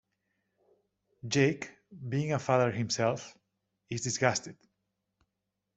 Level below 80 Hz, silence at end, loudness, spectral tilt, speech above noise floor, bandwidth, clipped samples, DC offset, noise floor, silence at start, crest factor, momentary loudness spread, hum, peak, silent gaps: -70 dBFS; 1.25 s; -31 LUFS; -4.5 dB/octave; 55 dB; 8.2 kHz; under 0.1%; under 0.1%; -85 dBFS; 1.25 s; 24 dB; 18 LU; none; -8 dBFS; none